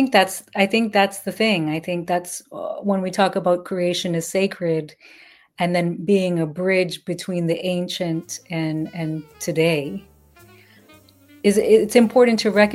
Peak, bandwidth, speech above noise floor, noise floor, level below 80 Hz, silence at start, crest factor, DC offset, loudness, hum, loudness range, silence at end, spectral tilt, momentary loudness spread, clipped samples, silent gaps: 0 dBFS; 16.5 kHz; 31 dB; -51 dBFS; -62 dBFS; 0 s; 20 dB; under 0.1%; -21 LUFS; none; 4 LU; 0 s; -5 dB/octave; 12 LU; under 0.1%; none